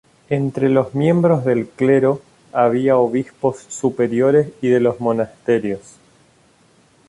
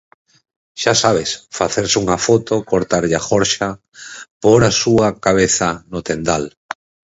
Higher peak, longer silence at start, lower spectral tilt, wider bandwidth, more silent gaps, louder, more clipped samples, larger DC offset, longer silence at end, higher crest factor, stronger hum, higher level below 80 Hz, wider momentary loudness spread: about the same, -2 dBFS vs 0 dBFS; second, 0.3 s vs 0.75 s; first, -7.5 dB/octave vs -4 dB/octave; first, 11.5 kHz vs 8 kHz; second, none vs 4.31-4.41 s; about the same, -18 LUFS vs -16 LUFS; neither; neither; first, 1.3 s vs 0.65 s; about the same, 16 dB vs 16 dB; neither; second, -58 dBFS vs -44 dBFS; second, 8 LU vs 19 LU